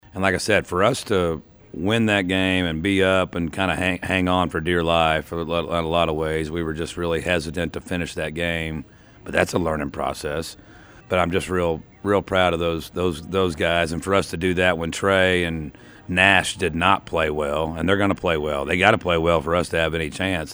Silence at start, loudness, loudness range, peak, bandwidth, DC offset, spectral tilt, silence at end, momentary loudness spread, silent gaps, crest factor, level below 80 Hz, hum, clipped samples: 0.15 s; -21 LUFS; 5 LU; 0 dBFS; over 20 kHz; under 0.1%; -5 dB/octave; 0 s; 9 LU; none; 22 dB; -42 dBFS; none; under 0.1%